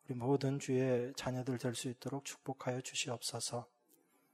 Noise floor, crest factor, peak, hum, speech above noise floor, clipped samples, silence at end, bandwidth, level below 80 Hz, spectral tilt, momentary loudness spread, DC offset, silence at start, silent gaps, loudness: -72 dBFS; 16 dB; -22 dBFS; none; 34 dB; under 0.1%; 0.7 s; 15.5 kHz; -74 dBFS; -5 dB/octave; 9 LU; under 0.1%; 0.1 s; none; -39 LUFS